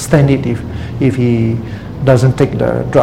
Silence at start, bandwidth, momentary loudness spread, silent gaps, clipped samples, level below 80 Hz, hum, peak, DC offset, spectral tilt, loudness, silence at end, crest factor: 0 s; 13.5 kHz; 10 LU; none; 0.2%; -32 dBFS; none; 0 dBFS; 0.8%; -7.5 dB/octave; -13 LUFS; 0 s; 12 dB